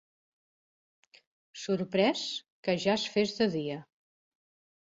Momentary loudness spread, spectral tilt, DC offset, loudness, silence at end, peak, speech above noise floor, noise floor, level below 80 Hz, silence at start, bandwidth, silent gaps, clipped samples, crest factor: 13 LU; -5 dB/octave; under 0.1%; -30 LUFS; 1.05 s; -14 dBFS; over 60 dB; under -90 dBFS; -72 dBFS; 1.55 s; 8 kHz; 2.52-2.63 s; under 0.1%; 20 dB